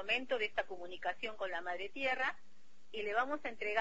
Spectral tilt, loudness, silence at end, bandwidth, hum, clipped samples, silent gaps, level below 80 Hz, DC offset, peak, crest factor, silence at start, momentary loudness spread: 0.5 dB/octave; -38 LUFS; 0 s; 7.6 kHz; none; under 0.1%; none; -70 dBFS; 0.5%; -18 dBFS; 20 dB; 0 s; 8 LU